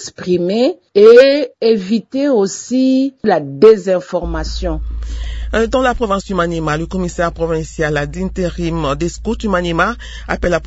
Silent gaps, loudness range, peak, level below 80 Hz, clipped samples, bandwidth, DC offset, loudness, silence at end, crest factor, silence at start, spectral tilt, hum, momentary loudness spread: none; 6 LU; 0 dBFS; -28 dBFS; 0.3%; 8 kHz; under 0.1%; -14 LUFS; 0 s; 14 dB; 0 s; -5.5 dB/octave; none; 12 LU